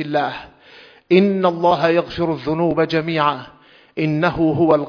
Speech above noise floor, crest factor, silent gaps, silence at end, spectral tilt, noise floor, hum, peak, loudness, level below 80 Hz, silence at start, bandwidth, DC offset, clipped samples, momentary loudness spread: 28 dB; 18 dB; none; 0 s; -8 dB/octave; -45 dBFS; none; 0 dBFS; -18 LUFS; -48 dBFS; 0 s; 5.4 kHz; under 0.1%; under 0.1%; 9 LU